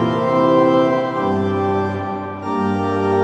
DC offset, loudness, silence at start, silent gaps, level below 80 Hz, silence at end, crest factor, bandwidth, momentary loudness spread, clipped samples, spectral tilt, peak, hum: under 0.1%; -18 LUFS; 0 s; none; -58 dBFS; 0 s; 14 dB; 8.6 kHz; 10 LU; under 0.1%; -8 dB/octave; -2 dBFS; none